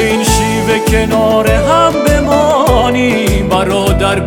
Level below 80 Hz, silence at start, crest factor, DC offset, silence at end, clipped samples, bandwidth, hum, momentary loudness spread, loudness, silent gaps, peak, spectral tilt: -20 dBFS; 0 s; 10 dB; under 0.1%; 0 s; under 0.1%; 18.5 kHz; none; 3 LU; -11 LUFS; none; 0 dBFS; -5 dB/octave